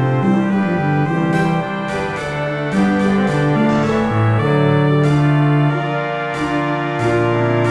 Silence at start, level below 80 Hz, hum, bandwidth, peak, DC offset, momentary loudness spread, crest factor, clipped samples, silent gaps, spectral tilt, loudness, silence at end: 0 s; -44 dBFS; none; 10.5 kHz; -4 dBFS; 0.4%; 7 LU; 12 dB; under 0.1%; none; -8 dB/octave; -16 LUFS; 0 s